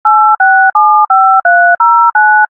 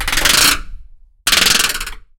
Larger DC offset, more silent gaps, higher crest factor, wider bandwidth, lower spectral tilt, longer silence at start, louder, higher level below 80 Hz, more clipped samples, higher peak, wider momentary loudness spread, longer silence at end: neither; neither; second, 6 dB vs 16 dB; second, 2 kHz vs over 20 kHz; first, -2 dB/octave vs 0 dB/octave; about the same, 0.05 s vs 0 s; first, -6 LUFS vs -12 LUFS; second, -74 dBFS vs -30 dBFS; first, 0.3% vs under 0.1%; about the same, 0 dBFS vs 0 dBFS; second, 1 LU vs 11 LU; second, 0.05 s vs 0.2 s